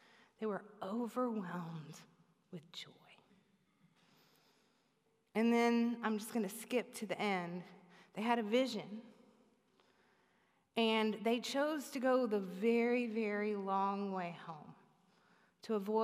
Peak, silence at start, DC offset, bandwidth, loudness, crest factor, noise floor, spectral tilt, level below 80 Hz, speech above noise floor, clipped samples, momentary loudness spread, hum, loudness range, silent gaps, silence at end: -22 dBFS; 0.4 s; under 0.1%; 15.5 kHz; -37 LUFS; 18 dB; -78 dBFS; -5 dB/octave; under -90 dBFS; 41 dB; under 0.1%; 17 LU; none; 11 LU; none; 0 s